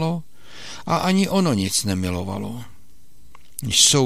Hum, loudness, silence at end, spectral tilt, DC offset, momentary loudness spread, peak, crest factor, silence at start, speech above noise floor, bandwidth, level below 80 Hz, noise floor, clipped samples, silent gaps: none; -20 LUFS; 0 s; -3.5 dB/octave; 1%; 20 LU; 0 dBFS; 22 dB; 0 s; 35 dB; 16 kHz; -50 dBFS; -54 dBFS; under 0.1%; none